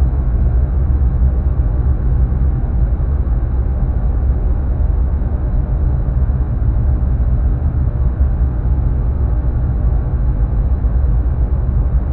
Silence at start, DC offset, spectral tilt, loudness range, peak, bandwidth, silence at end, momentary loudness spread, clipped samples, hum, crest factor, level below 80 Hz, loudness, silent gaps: 0 s; under 0.1%; -13.5 dB/octave; 1 LU; -2 dBFS; 2.2 kHz; 0 s; 2 LU; under 0.1%; none; 10 dB; -14 dBFS; -17 LUFS; none